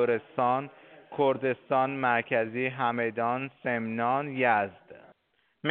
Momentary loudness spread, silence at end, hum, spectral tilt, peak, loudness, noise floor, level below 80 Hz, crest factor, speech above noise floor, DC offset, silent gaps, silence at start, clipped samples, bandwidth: 6 LU; 0 s; none; -4 dB/octave; -10 dBFS; -28 LUFS; -72 dBFS; -76 dBFS; 18 dB; 45 dB; under 0.1%; none; 0 s; under 0.1%; 4.4 kHz